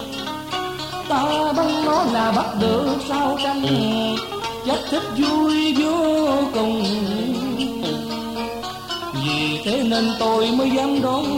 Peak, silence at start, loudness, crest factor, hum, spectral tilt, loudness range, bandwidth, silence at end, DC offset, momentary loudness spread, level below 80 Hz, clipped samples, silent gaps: -8 dBFS; 0 s; -21 LUFS; 12 dB; none; -5 dB/octave; 3 LU; 16.5 kHz; 0 s; under 0.1%; 9 LU; -50 dBFS; under 0.1%; none